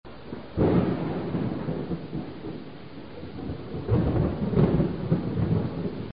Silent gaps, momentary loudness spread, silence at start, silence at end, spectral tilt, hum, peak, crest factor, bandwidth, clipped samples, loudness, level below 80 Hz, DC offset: none; 17 LU; 0 s; 0 s; -12.5 dB/octave; none; -8 dBFS; 18 dB; 5.2 kHz; under 0.1%; -27 LUFS; -42 dBFS; 0.5%